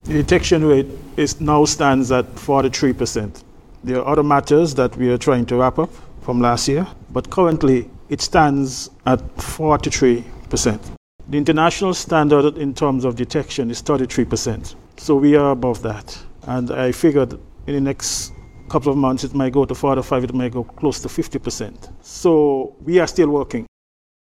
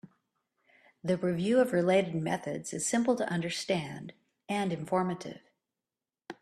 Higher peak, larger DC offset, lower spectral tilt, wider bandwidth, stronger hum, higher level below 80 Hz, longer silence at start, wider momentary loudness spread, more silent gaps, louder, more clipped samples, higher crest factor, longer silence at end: first, 0 dBFS vs -12 dBFS; neither; about the same, -5.5 dB/octave vs -5 dB/octave; first, 15 kHz vs 13.5 kHz; neither; first, -38 dBFS vs -70 dBFS; about the same, 0.05 s vs 0.05 s; second, 12 LU vs 15 LU; first, 10.97-11.19 s vs none; first, -18 LUFS vs -30 LUFS; neither; about the same, 18 dB vs 20 dB; first, 0.65 s vs 0.1 s